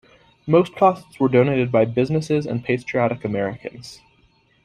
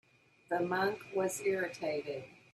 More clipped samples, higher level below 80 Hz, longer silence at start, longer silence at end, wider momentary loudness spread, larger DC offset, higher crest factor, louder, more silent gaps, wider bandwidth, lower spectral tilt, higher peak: neither; first, -56 dBFS vs -78 dBFS; about the same, 0.45 s vs 0.5 s; first, 0.7 s vs 0.2 s; first, 17 LU vs 7 LU; neither; about the same, 18 dB vs 16 dB; first, -20 LUFS vs -35 LUFS; neither; second, 11 kHz vs 13.5 kHz; first, -7.5 dB/octave vs -4.5 dB/octave; first, -2 dBFS vs -20 dBFS